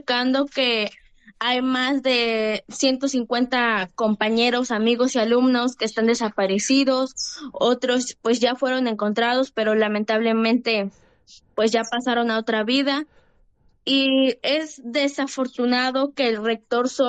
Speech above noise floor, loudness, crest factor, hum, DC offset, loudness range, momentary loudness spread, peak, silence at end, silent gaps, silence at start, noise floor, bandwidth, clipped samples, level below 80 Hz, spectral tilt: 37 dB; -21 LUFS; 14 dB; none; under 0.1%; 2 LU; 6 LU; -8 dBFS; 0 s; none; 0.1 s; -59 dBFS; 9.2 kHz; under 0.1%; -64 dBFS; -3.5 dB/octave